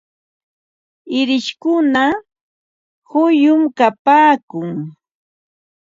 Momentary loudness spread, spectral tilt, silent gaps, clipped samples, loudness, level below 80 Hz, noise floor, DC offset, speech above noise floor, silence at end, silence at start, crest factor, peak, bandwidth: 14 LU; -5.5 dB/octave; 2.41-3.02 s, 3.99-4.05 s, 4.43-4.48 s; under 0.1%; -15 LUFS; -64 dBFS; under -90 dBFS; under 0.1%; over 76 dB; 1 s; 1.05 s; 16 dB; 0 dBFS; 7.6 kHz